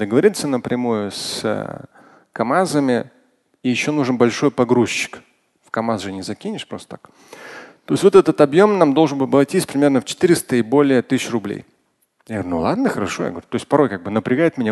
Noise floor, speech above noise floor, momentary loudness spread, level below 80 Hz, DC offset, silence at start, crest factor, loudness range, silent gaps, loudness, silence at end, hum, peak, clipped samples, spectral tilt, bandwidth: -64 dBFS; 46 dB; 16 LU; -54 dBFS; under 0.1%; 0 s; 18 dB; 6 LU; none; -18 LUFS; 0 s; none; 0 dBFS; under 0.1%; -5.5 dB/octave; 12.5 kHz